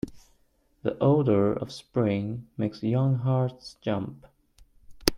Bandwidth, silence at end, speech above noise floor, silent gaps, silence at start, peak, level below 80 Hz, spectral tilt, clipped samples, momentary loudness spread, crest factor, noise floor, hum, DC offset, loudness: 16.5 kHz; 0 s; 40 dB; none; 0.05 s; 0 dBFS; -50 dBFS; -7 dB/octave; under 0.1%; 11 LU; 28 dB; -66 dBFS; none; under 0.1%; -27 LUFS